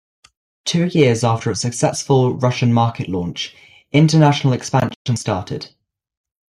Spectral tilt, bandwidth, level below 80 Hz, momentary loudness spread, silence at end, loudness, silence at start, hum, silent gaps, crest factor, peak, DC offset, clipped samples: -5.5 dB/octave; 12 kHz; -54 dBFS; 13 LU; 0.8 s; -17 LUFS; 0.65 s; none; 4.96-5.05 s; 16 dB; -2 dBFS; under 0.1%; under 0.1%